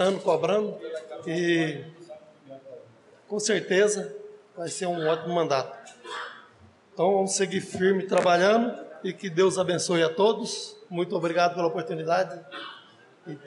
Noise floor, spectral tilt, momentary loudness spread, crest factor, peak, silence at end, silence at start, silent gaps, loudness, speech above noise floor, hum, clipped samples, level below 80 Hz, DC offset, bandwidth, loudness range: -55 dBFS; -4 dB/octave; 17 LU; 16 dB; -12 dBFS; 0 s; 0 s; none; -26 LUFS; 30 dB; none; under 0.1%; -80 dBFS; under 0.1%; 11.5 kHz; 5 LU